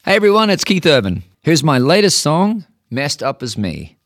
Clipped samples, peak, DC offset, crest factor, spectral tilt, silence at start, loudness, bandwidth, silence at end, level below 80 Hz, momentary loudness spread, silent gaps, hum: under 0.1%; -2 dBFS; under 0.1%; 14 dB; -4.5 dB/octave; 0.05 s; -14 LUFS; 16.5 kHz; 0.2 s; -48 dBFS; 11 LU; none; none